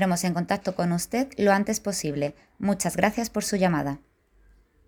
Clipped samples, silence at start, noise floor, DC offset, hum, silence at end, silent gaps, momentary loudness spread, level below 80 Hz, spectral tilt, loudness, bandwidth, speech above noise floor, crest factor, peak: under 0.1%; 0 s; -59 dBFS; under 0.1%; none; 0.9 s; none; 8 LU; -54 dBFS; -5 dB/octave; -26 LUFS; over 20 kHz; 34 dB; 22 dB; -4 dBFS